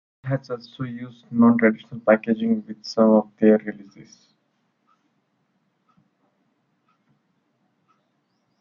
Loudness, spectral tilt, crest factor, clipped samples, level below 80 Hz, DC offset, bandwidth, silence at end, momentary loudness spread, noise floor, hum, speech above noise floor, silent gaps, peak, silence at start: -21 LUFS; -8 dB/octave; 20 dB; under 0.1%; -70 dBFS; under 0.1%; 7 kHz; 4.9 s; 16 LU; -70 dBFS; none; 49 dB; none; -4 dBFS; 0.25 s